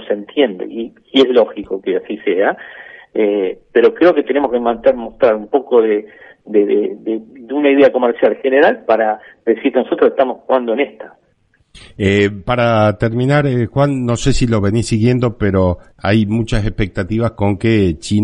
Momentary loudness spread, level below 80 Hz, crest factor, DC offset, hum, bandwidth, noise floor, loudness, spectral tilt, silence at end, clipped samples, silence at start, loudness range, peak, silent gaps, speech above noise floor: 8 LU; -34 dBFS; 14 dB; under 0.1%; none; 11 kHz; -58 dBFS; -15 LUFS; -6.5 dB/octave; 0 s; under 0.1%; 0 s; 3 LU; 0 dBFS; none; 43 dB